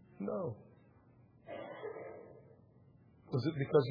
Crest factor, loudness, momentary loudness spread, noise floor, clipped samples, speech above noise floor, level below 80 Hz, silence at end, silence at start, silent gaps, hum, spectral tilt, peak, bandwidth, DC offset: 24 dB; -39 LUFS; 23 LU; -64 dBFS; under 0.1%; 30 dB; -76 dBFS; 0 s; 0.2 s; none; none; -7 dB/octave; -16 dBFS; 5.2 kHz; under 0.1%